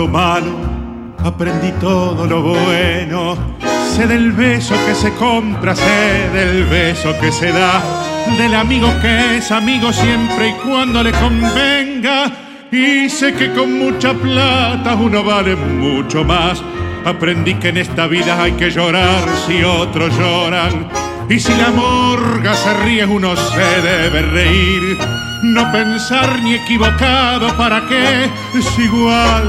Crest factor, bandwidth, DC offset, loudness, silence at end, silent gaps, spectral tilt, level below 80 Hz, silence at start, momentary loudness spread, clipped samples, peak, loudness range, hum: 14 dB; 15 kHz; under 0.1%; -13 LUFS; 0 s; none; -5 dB/octave; -26 dBFS; 0 s; 6 LU; under 0.1%; 0 dBFS; 2 LU; none